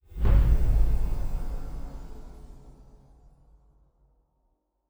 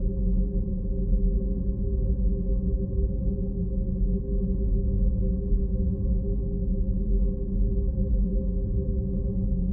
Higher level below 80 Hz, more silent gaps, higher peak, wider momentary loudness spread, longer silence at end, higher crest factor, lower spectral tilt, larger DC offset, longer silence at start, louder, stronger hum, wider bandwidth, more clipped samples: about the same, -28 dBFS vs -26 dBFS; neither; about the same, -10 dBFS vs -12 dBFS; first, 25 LU vs 3 LU; first, 2.35 s vs 0 s; first, 18 dB vs 12 dB; second, -8 dB/octave vs -17.5 dB/octave; neither; first, 0.15 s vs 0 s; about the same, -28 LUFS vs -28 LUFS; neither; first, over 20 kHz vs 1.1 kHz; neither